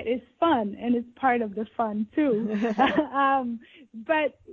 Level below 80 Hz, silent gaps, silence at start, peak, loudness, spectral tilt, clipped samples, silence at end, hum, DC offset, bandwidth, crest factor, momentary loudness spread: -60 dBFS; none; 0 s; -8 dBFS; -26 LUFS; -7 dB/octave; under 0.1%; 0 s; none; under 0.1%; 7 kHz; 18 dB; 8 LU